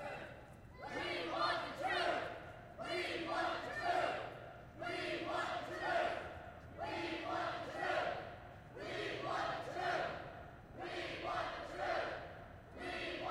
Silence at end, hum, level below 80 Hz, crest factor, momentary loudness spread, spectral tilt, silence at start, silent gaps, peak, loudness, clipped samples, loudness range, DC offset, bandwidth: 0 s; none; -66 dBFS; 18 dB; 15 LU; -4.5 dB/octave; 0 s; none; -24 dBFS; -41 LUFS; under 0.1%; 3 LU; under 0.1%; 16 kHz